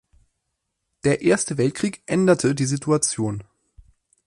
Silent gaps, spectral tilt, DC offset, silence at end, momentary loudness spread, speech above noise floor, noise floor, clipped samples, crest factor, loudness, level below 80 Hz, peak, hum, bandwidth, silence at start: none; -5 dB/octave; under 0.1%; 0.85 s; 8 LU; 57 dB; -78 dBFS; under 0.1%; 18 dB; -21 LUFS; -56 dBFS; -6 dBFS; none; 11.5 kHz; 1.05 s